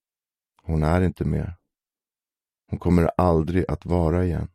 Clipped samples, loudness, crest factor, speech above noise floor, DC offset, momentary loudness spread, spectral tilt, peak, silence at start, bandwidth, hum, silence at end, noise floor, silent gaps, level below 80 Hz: under 0.1%; -23 LUFS; 18 dB; over 68 dB; under 0.1%; 9 LU; -9 dB/octave; -6 dBFS; 0.65 s; 12.5 kHz; none; 0.1 s; under -90 dBFS; none; -36 dBFS